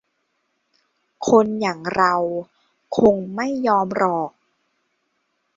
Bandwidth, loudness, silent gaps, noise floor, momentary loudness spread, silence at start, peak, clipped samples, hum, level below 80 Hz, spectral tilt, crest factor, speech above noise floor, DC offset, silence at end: 7.6 kHz; -20 LUFS; none; -71 dBFS; 10 LU; 1.2 s; -2 dBFS; under 0.1%; none; -60 dBFS; -6 dB/octave; 20 dB; 53 dB; under 0.1%; 1.25 s